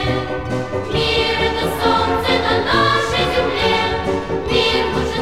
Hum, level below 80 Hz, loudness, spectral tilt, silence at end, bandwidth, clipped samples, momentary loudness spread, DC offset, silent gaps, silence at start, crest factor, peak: none; -34 dBFS; -17 LUFS; -5 dB/octave; 0 s; 16 kHz; under 0.1%; 6 LU; 1%; none; 0 s; 14 dB; -4 dBFS